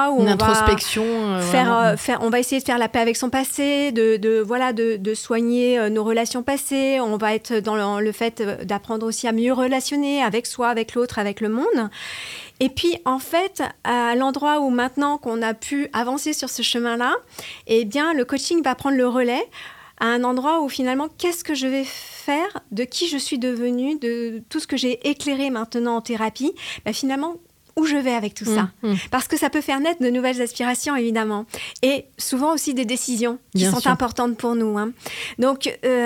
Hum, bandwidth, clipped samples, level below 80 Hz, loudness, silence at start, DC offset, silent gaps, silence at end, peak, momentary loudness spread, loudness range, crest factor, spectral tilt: none; 18 kHz; under 0.1%; -48 dBFS; -21 LUFS; 0 s; under 0.1%; none; 0 s; -2 dBFS; 7 LU; 4 LU; 18 dB; -4 dB/octave